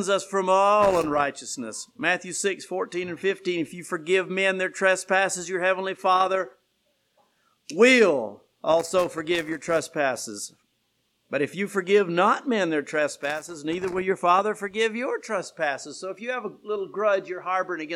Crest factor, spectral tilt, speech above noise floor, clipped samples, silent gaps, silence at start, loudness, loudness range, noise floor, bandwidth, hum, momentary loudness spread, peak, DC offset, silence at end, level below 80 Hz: 20 dB; -3.5 dB/octave; 47 dB; under 0.1%; none; 0 s; -24 LUFS; 4 LU; -72 dBFS; 15 kHz; none; 12 LU; -4 dBFS; under 0.1%; 0 s; -64 dBFS